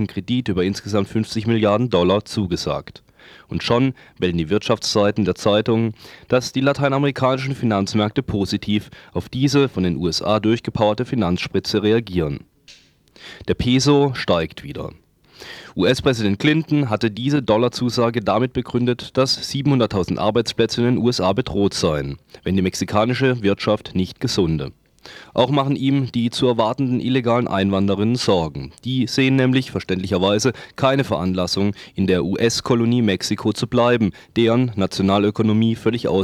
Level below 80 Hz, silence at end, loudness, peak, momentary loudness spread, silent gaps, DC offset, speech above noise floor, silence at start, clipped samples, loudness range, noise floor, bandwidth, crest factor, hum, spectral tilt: -46 dBFS; 0 s; -19 LUFS; -2 dBFS; 7 LU; none; under 0.1%; 30 dB; 0 s; under 0.1%; 2 LU; -49 dBFS; 15 kHz; 16 dB; none; -6 dB/octave